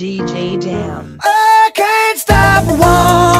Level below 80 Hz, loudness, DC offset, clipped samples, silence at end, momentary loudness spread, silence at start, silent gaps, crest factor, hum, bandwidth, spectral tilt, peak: -26 dBFS; -11 LUFS; under 0.1%; 0.4%; 0 s; 11 LU; 0 s; none; 10 dB; none; 16.5 kHz; -4.5 dB/octave; 0 dBFS